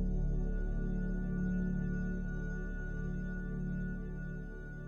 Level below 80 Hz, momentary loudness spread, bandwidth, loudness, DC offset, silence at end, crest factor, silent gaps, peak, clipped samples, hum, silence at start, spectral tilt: -38 dBFS; 7 LU; 6.8 kHz; -39 LUFS; under 0.1%; 0 s; 10 dB; none; -24 dBFS; under 0.1%; none; 0 s; -9.5 dB/octave